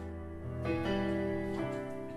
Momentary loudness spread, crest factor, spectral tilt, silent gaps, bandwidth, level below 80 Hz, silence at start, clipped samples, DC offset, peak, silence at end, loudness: 9 LU; 14 dB; -7.5 dB/octave; none; 12.5 kHz; -50 dBFS; 0 s; under 0.1%; under 0.1%; -22 dBFS; 0 s; -36 LUFS